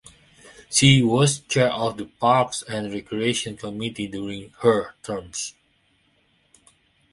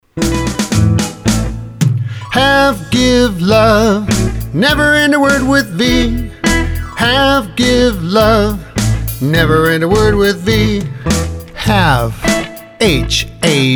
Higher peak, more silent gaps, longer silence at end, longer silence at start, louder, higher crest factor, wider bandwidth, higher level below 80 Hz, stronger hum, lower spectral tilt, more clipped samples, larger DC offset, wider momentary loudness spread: about the same, -2 dBFS vs 0 dBFS; neither; first, 1.6 s vs 0 s; first, 0.45 s vs 0.15 s; second, -22 LUFS vs -12 LUFS; first, 22 dB vs 12 dB; second, 11.5 kHz vs over 20 kHz; second, -54 dBFS vs -24 dBFS; neither; about the same, -4.5 dB/octave vs -5 dB/octave; neither; neither; first, 15 LU vs 7 LU